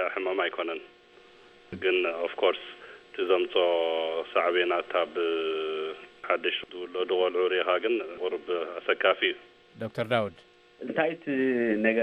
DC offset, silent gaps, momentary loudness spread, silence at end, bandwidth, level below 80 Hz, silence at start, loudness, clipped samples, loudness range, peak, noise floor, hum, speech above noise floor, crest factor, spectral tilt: under 0.1%; none; 12 LU; 0 s; 8.2 kHz; -72 dBFS; 0 s; -28 LUFS; under 0.1%; 2 LU; -8 dBFS; -55 dBFS; none; 27 dB; 20 dB; -6.5 dB/octave